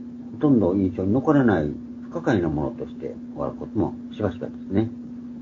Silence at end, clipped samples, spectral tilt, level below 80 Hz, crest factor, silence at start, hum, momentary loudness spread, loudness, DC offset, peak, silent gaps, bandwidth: 0 s; under 0.1%; -9 dB/octave; -48 dBFS; 18 dB; 0 s; none; 15 LU; -24 LUFS; under 0.1%; -4 dBFS; none; 7.2 kHz